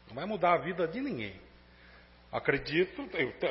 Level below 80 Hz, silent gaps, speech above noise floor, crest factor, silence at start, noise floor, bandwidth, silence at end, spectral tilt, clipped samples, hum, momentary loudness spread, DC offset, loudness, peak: -58 dBFS; none; 25 dB; 22 dB; 0.05 s; -57 dBFS; 5.8 kHz; 0 s; -9 dB/octave; under 0.1%; 60 Hz at -60 dBFS; 11 LU; under 0.1%; -32 LUFS; -12 dBFS